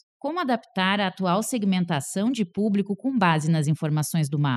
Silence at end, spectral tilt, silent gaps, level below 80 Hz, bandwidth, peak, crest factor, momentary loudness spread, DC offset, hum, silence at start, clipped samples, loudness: 0 s; -5.5 dB/octave; none; -72 dBFS; 14 kHz; -8 dBFS; 16 dB; 5 LU; under 0.1%; none; 0.25 s; under 0.1%; -24 LUFS